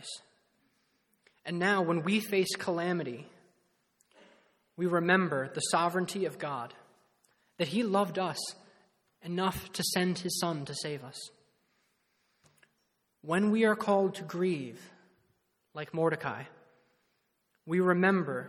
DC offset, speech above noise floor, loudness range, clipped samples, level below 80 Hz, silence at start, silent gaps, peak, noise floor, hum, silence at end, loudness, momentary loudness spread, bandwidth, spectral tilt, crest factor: under 0.1%; 47 dB; 5 LU; under 0.1%; -70 dBFS; 0 s; none; -10 dBFS; -77 dBFS; none; 0 s; -31 LUFS; 18 LU; 17.5 kHz; -4.5 dB/octave; 24 dB